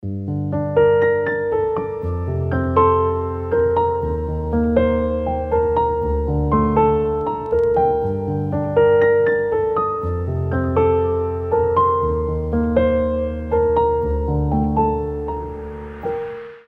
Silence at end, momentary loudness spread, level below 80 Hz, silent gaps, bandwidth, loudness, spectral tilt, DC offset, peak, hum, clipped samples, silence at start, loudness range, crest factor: 0.1 s; 9 LU; -30 dBFS; none; 4 kHz; -19 LUFS; -10.5 dB/octave; under 0.1%; -2 dBFS; none; under 0.1%; 0.05 s; 2 LU; 16 dB